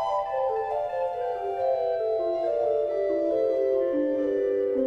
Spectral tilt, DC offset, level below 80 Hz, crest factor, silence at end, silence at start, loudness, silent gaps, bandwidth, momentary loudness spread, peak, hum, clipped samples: -7 dB/octave; under 0.1%; -60 dBFS; 10 dB; 0 s; 0 s; -26 LUFS; none; 6.4 kHz; 4 LU; -14 dBFS; none; under 0.1%